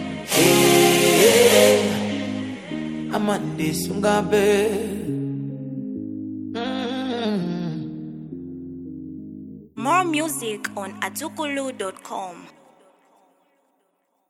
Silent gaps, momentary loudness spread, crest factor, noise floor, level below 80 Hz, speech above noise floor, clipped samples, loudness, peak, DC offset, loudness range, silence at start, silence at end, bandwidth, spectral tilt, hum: none; 21 LU; 20 dB; -69 dBFS; -58 dBFS; 46 dB; under 0.1%; -21 LUFS; -2 dBFS; under 0.1%; 12 LU; 0 s; 1.8 s; 16.5 kHz; -3.5 dB/octave; none